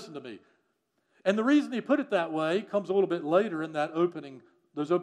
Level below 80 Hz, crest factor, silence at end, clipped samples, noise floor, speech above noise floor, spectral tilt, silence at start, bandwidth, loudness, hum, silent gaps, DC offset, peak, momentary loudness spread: -88 dBFS; 18 dB; 0 s; under 0.1%; -76 dBFS; 48 dB; -6.5 dB/octave; 0 s; 10 kHz; -28 LUFS; none; none; under 0.1%; -10 dBFS; 18 LU